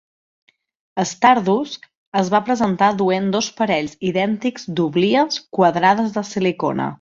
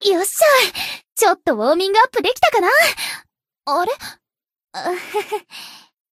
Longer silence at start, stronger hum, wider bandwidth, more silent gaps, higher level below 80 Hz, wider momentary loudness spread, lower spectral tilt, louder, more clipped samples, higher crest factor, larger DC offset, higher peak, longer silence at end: first, 0.95 s vs 0 s; neither; second, 7.6 kHz vs 15.5 kHz; first, 1.97-2.12 s vs none; about the same, -60 dBFS vs -60 dBFS; second, 9 LU vs 19 LU; first, -5 dB/octave vs -1 dB/octave; about the same, -18 LUFS vs -17 LUFS; neither; about the same, 18 dB vs 18 dB; neither; about the same, 0 dBFS vs 0 dBFS; second, 0.05 s vs 0.35 s